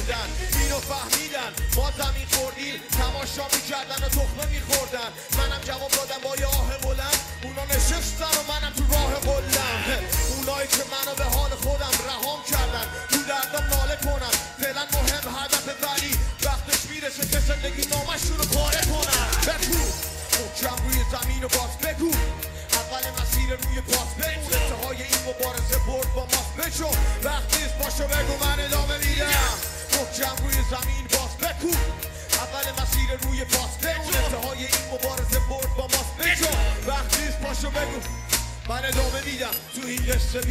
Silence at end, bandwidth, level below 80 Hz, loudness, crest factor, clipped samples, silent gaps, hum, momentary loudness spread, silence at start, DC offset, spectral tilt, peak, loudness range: 0 s; 16.5 kHz; -28 dBFS; -24 LUFS; 20 dB; under 0.1%; none; none; 5 LU; 0 s; under 0.1%; -2.5 dB/octave; -4 dBFS; 2 LU